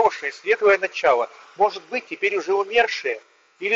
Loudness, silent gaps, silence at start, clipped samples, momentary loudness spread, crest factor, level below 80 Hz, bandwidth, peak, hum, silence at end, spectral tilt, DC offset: -21 LUFS; none; 0 s; under 0.1%; 11 LU; 18 dB; -66 dBFS; 7.6 kHz; -4 dBFS; none; 0 s; -2.5 dB/octave; under 0.1%